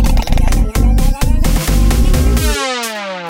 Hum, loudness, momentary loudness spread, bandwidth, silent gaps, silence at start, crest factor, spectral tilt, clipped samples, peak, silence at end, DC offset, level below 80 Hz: none; -15 LUFS; 4 LU; 17 kHz; none; 0 s; 10 dB; -5 dB/octave; under 0.1%; -2 dBFS; 0 s; under 0.1%; -12 dBFS